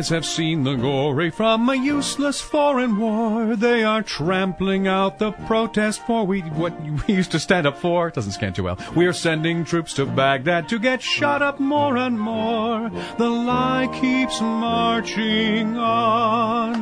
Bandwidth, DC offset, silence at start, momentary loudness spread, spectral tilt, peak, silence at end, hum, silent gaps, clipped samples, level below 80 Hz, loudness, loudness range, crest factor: 11 kHz; under 0.1%; 0 s; 5 LU; -5 dB/octave; -2 dBFS; 0 s; none; none; under 0.1%; -48 dBFS; -21 LUFS; 2 LU; 18 dB